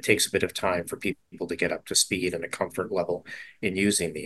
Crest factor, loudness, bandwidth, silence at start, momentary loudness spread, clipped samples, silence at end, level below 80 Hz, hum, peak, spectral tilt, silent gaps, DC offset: 24 dB; -27 LUFS; 13 kHz; 0 s; 10 LU; under 0.1%; 0 s; -56 dBFS; none; -4 dBFS; -3 dB/octave; none; under 0.1%